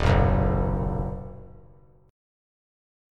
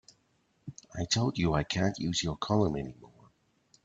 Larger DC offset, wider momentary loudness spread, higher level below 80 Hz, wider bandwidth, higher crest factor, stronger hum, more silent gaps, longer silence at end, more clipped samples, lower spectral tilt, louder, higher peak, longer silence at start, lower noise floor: neither; first, 20 LU vs 17 LU; first, -32 dBFS vs -52 dBFS; about the same, 8 kHz vs 8.8 kHz; about the same, 18 dB vs 20 dB; neither; neither; first, 1.55 s vs 0.8 s; neither; first, -8 dB/octave vs -5 dB/octave; first, -25 LUFS vs -30 LUFS; first, -8 dBFS vs -12 dBFS; second, 0 s vs 0.65 s; second, -54 dBFS vs -72 dBFS